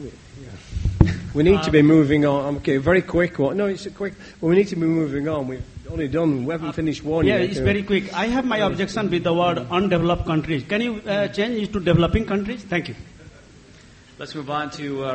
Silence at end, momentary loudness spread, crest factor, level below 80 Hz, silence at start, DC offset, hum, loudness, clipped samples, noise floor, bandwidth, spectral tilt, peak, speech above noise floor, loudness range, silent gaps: 0 s; 12 LU; 20 dB; -36 dBFS; 0 s; under 0.1%; none; -21 LUFS; under 0.1%; -47 dBFS; 8.4 kHz; -7 dB/octave; 0 dBFS; 26 dB; 5 LU; none